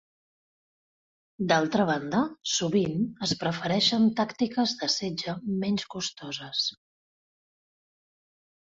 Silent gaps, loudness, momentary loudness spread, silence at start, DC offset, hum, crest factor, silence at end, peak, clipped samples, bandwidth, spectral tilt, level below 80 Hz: none; -27 LUFS; 9 LU; 1.4 s; under 0.1%; none; 20 dB; 1.9 s; -10 dBFS; under 0.1%; 8 kHz; -4 dB/octave; -66 dBFS